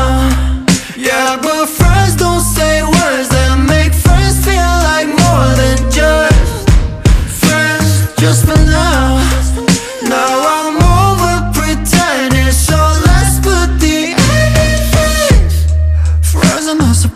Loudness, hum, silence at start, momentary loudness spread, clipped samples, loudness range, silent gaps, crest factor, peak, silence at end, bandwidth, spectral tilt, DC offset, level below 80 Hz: -10 LUFS; none; 0 s; 4 LU; under 0.1%; 1 LU; none; 10 dB; 0 dBFS; 0 s; 15.5 kHz; -4.5 dB/octave; under 0.1%; -14 dBFS